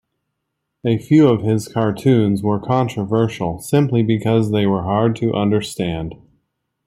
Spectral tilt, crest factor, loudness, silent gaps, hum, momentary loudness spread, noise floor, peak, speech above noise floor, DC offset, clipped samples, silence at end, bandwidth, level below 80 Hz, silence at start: -7.5 dB/octave; 16 dB; -18 LUFS; none; none; 9 LU; -76 dBFS; -2 dBFS; 59 dB; under 0.1%; under 0.1%; 0.7 s; 15 kHz; -50 dBFS; 0.85 s